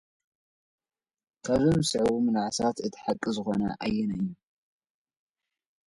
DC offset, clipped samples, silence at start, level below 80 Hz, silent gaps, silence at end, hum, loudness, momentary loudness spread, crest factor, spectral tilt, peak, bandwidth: under 0.1%; under 0.1%; 1.45 s; -56 dBFS; none; 1.5 s; none; -28 LUFS; 9 LU; 18 dB; -5.5 dB/octave; -12 dBFS; 11.5 kHz